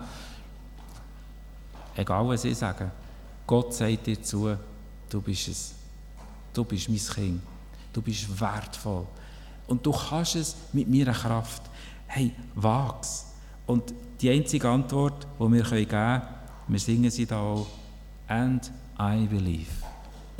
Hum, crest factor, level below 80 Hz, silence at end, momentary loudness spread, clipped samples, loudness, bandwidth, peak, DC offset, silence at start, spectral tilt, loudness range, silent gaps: none; 20 dB; -44 dBFS; 0 s; 22 LU; under 0.1%; -28 LUFS; 16.5 kHz; -8 dBFS; under 0.1%; 0 s; -5.5 dB/octave; 6 LU; none